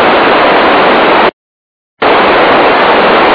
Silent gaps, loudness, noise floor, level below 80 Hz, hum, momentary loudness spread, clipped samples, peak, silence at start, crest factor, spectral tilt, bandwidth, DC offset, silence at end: 1.33-1.97 s; -6 LUFS; under -90 dBFS; -38 dBFS; none; 3 LU; 0.4%; 0 dBFS; 0 s; 6 dB; -6.5 dB/octave; 5.4 kHz; under 0.1%; 0 s